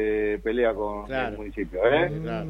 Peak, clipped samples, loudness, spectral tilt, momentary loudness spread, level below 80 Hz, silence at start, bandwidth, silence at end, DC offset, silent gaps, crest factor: -8 dBFS; under 0.1%; -26 LUFS; -7.5 dB/octave; 10 LU; -42 dBFS; 0 s; 6.4 kHz; 0 s; under 0.1%; none; 16 dB